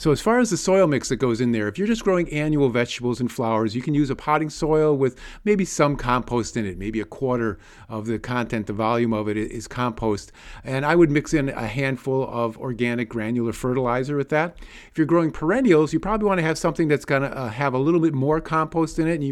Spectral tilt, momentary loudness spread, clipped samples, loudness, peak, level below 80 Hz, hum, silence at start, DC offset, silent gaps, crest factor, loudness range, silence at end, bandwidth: -6 dB/octave; 9 LU; under 0.1%; -22 LUFS; -6 dBFS; -44 dBFS; none; 0 s; under 0.1%; none; 16 dB; 4 LU; 0 s; 13 kHz